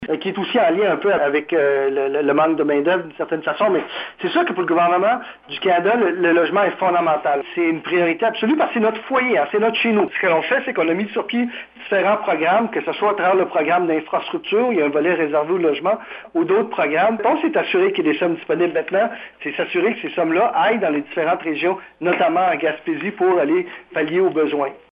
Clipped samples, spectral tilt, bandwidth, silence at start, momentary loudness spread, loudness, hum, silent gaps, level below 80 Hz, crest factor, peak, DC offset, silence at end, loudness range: under 0.1%; -8.5 dB/octave; 5.2 kHz; 0 s; 6 LU; -19 LUFS; none; none; -66 dBFS; 16 dB; -4 dBFS; under 0.1%; 0.15 s; 2 LU